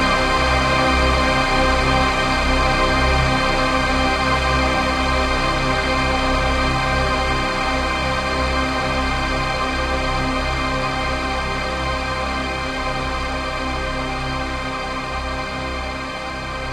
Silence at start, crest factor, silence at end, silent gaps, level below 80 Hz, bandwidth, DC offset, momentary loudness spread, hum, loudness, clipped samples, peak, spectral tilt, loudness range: 0 s; 16 dB; 0 s; none; -26 dBFS; 13.5 kHz; under 0.1%; 8 LU; none; -19 LUFS; under 0.1%; -4 dBFS; -4.5 dB/octave; 7 LU